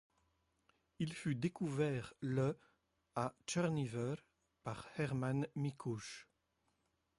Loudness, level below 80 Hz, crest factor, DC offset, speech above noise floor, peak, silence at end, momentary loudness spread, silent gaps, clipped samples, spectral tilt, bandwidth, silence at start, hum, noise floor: -41 LUFS; -72 dBFS; 18 dB; under 0.1%; 42 dB; -24 dBFS; 0.95 s; 11 LU; none; under 0.1%; -6.5 dB/octave; 11.5 kHz; 1 s; none; -82 dBFS